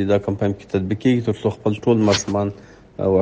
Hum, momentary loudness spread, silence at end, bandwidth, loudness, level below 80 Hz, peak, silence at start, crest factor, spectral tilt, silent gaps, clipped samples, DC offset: none; 7 LU; 0 s; 10 kHz; -20 LUFS; -50 dBFS; -4 dBFS; 0 s; 16 dB; -6 dB/octave; none; under 0.1%; under 0.1%